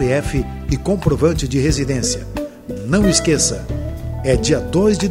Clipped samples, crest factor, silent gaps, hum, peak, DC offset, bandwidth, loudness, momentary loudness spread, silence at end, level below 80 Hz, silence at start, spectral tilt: under 0.1%; 16 dB; none; none; -2 dBFS; under 0.1%; 16 kHz; -18 LUFS; 12 LU; 0 s; -28 dBFS; 0 s; -5 dB/octave